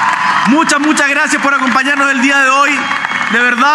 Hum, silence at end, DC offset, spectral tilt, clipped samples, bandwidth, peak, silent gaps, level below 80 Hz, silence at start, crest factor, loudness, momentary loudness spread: none; 0 s; under 0.1%; -2.5 dB/octave; under 0.1%; 14 kHz; 0 dBFS; none; -64 dBFS; 0 s; 10 dB; -10 LUFS; 4 LU